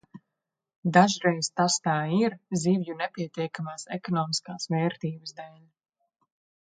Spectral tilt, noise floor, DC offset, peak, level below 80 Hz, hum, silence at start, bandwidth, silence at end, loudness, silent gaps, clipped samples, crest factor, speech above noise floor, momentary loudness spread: -4.5 dB/octave; -86 dBFS; under 0.1%; -4 dBFS; -74 dBFS; none; 0.15 s; 9.4 kHz; 1.1 s; -27 LUFS; 0.76-0.83 s; under 0.1%; 24 dB; 59 dB; 14 LU